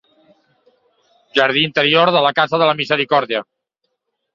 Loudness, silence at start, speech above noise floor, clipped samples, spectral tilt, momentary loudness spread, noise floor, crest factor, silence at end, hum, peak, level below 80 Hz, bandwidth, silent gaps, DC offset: -15 LUFS; 1.35 s; 58 dB; under 0.1%; -5.5 dB/octave; 7 LU; -74 dBFS; 16 dB; 0.95 s; none; -2 dBFS; -64 dBFS; 7.6 kHz; none; under 0.1%